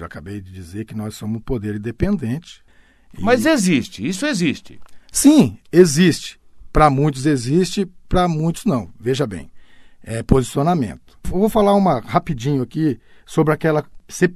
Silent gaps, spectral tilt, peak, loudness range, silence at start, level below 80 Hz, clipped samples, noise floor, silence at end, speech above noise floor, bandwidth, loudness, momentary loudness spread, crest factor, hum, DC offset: none; -5.5 dB/octave; 0 dBFS; 5 LU; 0 s; -36 dBFS; under 0.1%; -40 dBFS; 0 s; 22 dB; 14 kHz; -18 LUFS; 15 LU; 18 dB; none; under 0.1%